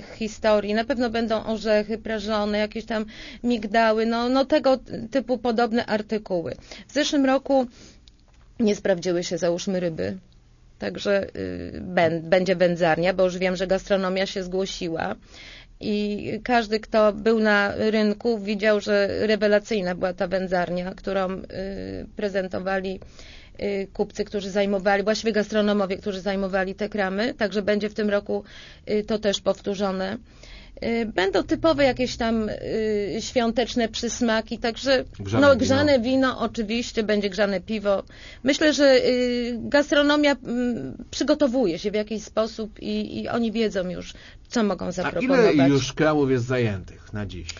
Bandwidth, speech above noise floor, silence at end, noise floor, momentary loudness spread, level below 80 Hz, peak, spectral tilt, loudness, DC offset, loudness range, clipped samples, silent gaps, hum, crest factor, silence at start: 7.4 kHz; 29 dB; 0 s; -52 dBFS; 11 LU; -48 dBFS; -6 dBFS; -5 dB/octave; -23 LUFS; under 0.1%; 5 LU; under 0.1%; none; none; 18 dB; 0 s